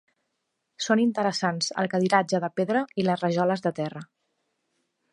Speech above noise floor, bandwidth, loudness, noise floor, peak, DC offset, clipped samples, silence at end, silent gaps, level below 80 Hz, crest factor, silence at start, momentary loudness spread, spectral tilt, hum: 54 dB; 11.5 kHz; -25 LUFS; -79 dBFS; -6 dBFS; under 0.1%; under 0.1%; 1.1 s; none; -74 dBFS; 22 dB; 0.8 s; 9 LU; -5 dB/octave; none